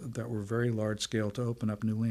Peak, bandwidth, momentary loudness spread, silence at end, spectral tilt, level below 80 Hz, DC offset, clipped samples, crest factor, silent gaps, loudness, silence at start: -18 dBFS; 13.5 kHz; 4 LU; 0 s; -6 dB/octave; -62 dBFS; under 0.1%; under 0.1%; 14 dB; none; -33 LUFS; 0 s